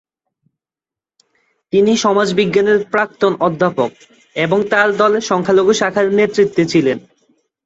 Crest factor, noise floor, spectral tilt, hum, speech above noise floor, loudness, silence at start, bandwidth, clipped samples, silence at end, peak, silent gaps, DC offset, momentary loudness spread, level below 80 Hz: 14 dB; -89 dBFS; -5 dB/octave; none; 75 dB; -14 LUFS; 1.75 s; 8 kHz; under 0.1%; 0.65 s; 0 dBFS; none; under 0.1%; 6 LU; -58 dBFS